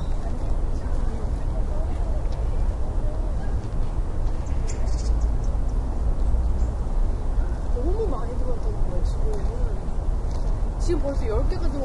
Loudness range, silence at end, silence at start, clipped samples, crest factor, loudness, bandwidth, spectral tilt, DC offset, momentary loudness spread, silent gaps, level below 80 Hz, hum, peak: 2 LU; 0 s; 0 s; under 0.1%; 12 dB; -28 LUFS; 10.5 kHz; -7.5 dB/octave; under 0.1%; 4 LU; none; -24 dBFS; none; -10 dBFS